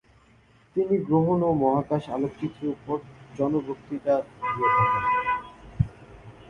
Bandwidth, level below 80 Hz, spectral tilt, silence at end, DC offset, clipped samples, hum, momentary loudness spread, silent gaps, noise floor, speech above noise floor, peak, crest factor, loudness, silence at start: 9.6 kHz; -50 dBFS; -9 dB/octave; 0 s; under 0.1%; under 0.1%; none; 11 LU; none; -58 dBFS; 33 dB; -8 dBFS; 18 dB; -26 LUFS; 0.75 s